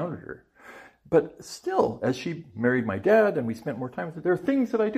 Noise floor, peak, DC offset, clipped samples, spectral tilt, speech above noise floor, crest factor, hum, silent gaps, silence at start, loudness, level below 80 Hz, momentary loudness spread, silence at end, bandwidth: -49 dBFS; -8 dBFS; under 0.1%; under 0.1%; -6.5 dB/octave; 24 dB; 18 dB; none; none; 0 s; -26 LUFS; -64 dBFS; 14 LU; 0 s; 15 kHz